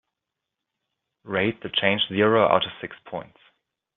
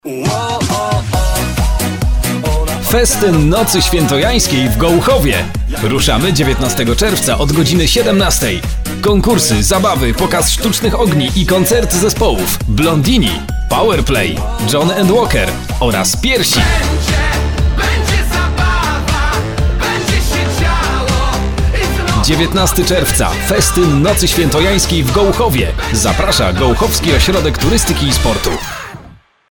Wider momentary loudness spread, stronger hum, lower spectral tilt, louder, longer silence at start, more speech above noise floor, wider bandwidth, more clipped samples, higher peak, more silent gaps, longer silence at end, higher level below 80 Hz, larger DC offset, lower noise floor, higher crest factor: first, 17 LU vs 5 LU; neither; first, -8.5 dB/octave vs -4 dB/octave; second, -22 LUFS vs -12 LUFS; first, 1.25 s vs 0.05 s; first, 61 dB vs 28 dB; second, 4.2 kHz vs over 20 kHz; neither; about the same, -2 dBFS vs 0 dBFS; neither; first, 0.75 s vs 0.35 s; second, -66 dBFS vs -18 dBFS; neither; first, -84 dBFS vs -39 dBFS; first, 22 dB vs 12 dB